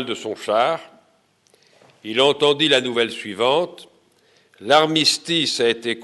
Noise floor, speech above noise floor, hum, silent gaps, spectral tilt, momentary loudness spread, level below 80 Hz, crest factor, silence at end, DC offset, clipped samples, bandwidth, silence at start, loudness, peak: -60 dBFS; 41 dB; none; none; -3 dB/octave; 11 LU; -72 dBFS; 18 dB; 0 s; under 0.1%; under 0.1%; 12 kHz; 0 s; -19 LUFS; -4 dBFS